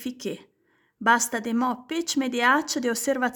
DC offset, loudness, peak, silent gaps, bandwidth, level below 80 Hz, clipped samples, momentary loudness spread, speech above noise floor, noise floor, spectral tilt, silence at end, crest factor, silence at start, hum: under 0.1%; -24 LUFS; -6 dBFS; none; 19 kHz; -72 dBFS; under 0.1%; 13 LU; 43 dB; -67 dBFS; -2 dB/octave; 0 s; 18 dB; 0 s; none